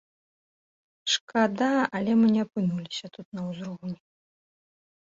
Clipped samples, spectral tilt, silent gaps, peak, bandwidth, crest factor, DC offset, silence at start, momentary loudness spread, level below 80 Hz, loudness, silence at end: under 0.1%; -5 dB/octave; 1.21-1.28 s, 3.25-3.32 s; -8 dBFS; 7.8 kHz; 20 dB; under 0.1%; 1.05 s; 15 LU; -70 dBFS; -26 LUFS; 1.1 s